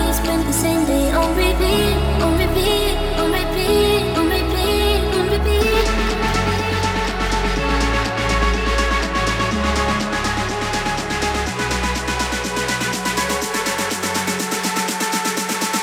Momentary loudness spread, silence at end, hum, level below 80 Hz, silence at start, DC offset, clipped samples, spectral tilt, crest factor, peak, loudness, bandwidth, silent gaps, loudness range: 4 LU; 0 s; none; -24 dBFS; 0 s; under 0.1%; under 0.1%; -4 dB/octave; 14 dB; -4 dBFS; -19 LUFS; 19 kHz; none; 3 LU